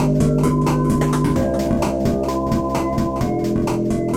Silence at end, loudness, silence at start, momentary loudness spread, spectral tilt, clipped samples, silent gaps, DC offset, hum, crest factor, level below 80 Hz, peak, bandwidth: 0 s; -19 LUFS; 0 s; 4 LU; -7.5 dB/octave; under 0.1%; none; under 0.1%; none; 12 dB; -32 dBFS; -6 dBFS; 16 kHz